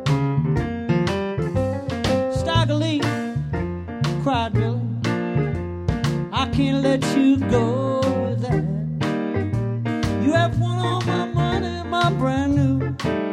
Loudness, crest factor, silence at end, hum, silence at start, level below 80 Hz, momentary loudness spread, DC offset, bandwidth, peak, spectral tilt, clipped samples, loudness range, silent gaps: -22 LUFS; 16 dB; 0 s; none; 0 s; -38 dBFS; 6 LU; under 0.1%; 12 kHz; -6 dBFS; -7 dB/octave; under 0.1%; 2 LU; none